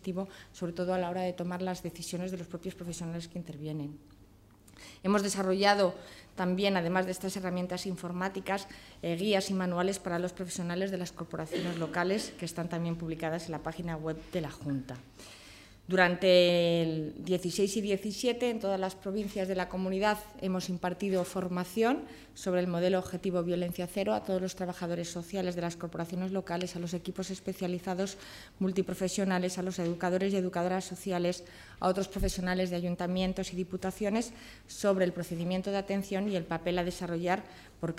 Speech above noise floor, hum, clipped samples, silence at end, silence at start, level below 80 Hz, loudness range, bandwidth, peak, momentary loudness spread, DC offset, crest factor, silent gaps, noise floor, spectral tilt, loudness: 26 dB; none; under 0.1%; 0 s; 0.05 s; -56 dBFS; 7 LU; 16 kHz; -10 dBFS; 11 LU; under 0.1%; 22 dB; none; -58 dBFS; -5 dB/octave; -33 LUFS